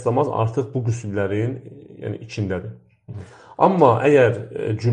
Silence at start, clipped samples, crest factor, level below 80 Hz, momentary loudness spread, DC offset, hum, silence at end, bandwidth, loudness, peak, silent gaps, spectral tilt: 0 s; under 0.1%; 20 dB; -56 dBFS; 23 LU; under 0.1%; none; 0 s; 9.4 kHz; -20 LUFS; 0 dBFS; none; -7.5 dB/octave